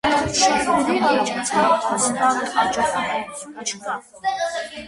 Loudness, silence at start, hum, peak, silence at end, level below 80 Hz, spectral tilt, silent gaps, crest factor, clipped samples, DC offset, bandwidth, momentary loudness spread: -20 LUFS; 0.05 s; none; -4 dBFS; 0 s; -50 dBFS; -2.5 dB/octave; none; 16 dB; under 0.1%; under 0.1%; 11.5 kHz; 11 LU